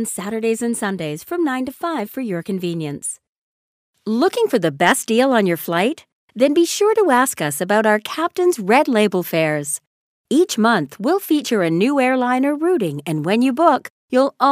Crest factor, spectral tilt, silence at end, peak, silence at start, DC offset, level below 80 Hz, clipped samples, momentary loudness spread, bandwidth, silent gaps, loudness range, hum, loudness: 18 dB; -4.5 dB/octave; 0 s; 0 dBFS; 0 s; under 0.1%; -68 dBFS; under 0.1%; 9 LU; 16 kHz; 3.29-3.94 s, 6.13-6.28 s, 9.87-10.24 s, 13.90-14.08 s; 6 LU; none; -18 LUFS